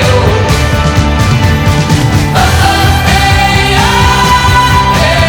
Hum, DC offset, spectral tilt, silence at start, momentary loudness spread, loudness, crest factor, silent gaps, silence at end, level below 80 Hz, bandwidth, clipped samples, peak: none; under 0.1%; -4.5 dB/octave; 0 s; 3 LU; -8 LUFS; 8 dB; none; 0 s; -16 dBFS; over 20 kHz; 0.4%; 0 dBFS